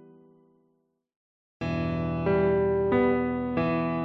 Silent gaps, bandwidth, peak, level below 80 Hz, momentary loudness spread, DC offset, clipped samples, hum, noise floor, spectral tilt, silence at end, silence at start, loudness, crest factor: none; 6 kHz; -12 dBFS; -46 dBFS; 6 LU; under 0.1%; under 0.1%; none; -72 dBFS; -9.5 dB/octave; 0 s; 1.6 s; -26 LUFS; 16 dB